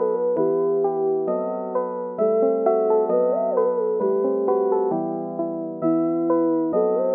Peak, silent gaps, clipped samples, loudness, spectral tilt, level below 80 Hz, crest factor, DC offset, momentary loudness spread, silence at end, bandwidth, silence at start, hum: -6 dBFS; none; under 0.1%; -22 LUFS; -11.5 dB/octave; -74 dBFS; 14 dB; under 0.1%; 6 LU; 0 s; 2.6 kHz; 0 s; none